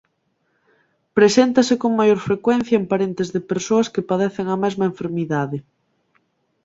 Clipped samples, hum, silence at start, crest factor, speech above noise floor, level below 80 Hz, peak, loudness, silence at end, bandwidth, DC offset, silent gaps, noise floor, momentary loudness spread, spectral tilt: under 0.1%; none; 1.15 s; 18 dB; 50 dB; -60 dBFS; -2 dBFS; -19 LUFS; 1.05 s; 8 kHz; under 0.1%; none; -68 dBFS; 9 LU; -5.5 dB/octave